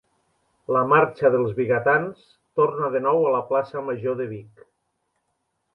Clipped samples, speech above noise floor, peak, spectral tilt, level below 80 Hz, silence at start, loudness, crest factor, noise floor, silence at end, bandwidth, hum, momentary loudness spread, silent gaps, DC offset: under 0.1%; 53 dB; -4 dBFS; -9 dB/octave; -66 dBFS; 0.7 s; -22 LUFS; 20 dB; -75 dBFS; 1.3 s; 5.6 kHz; none; 12 LU; none; under 0.1%